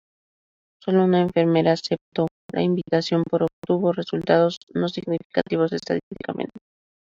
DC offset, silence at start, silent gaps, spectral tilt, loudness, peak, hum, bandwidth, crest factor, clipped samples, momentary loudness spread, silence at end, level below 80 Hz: under 0.1%; 0.85 s; 2.01-2.12 s, 2.31-2.49 s, 3.53-3.62 s, 4.57-4.67 s, 5.25-5.30 s, 6.03-6.11 s; -7 dB/octave; -23 LUFS; -4 dBFS; none; 7.6 kHz; 18 dB; under 0.1%; 9 LU; 0.45 s; -62 dBFS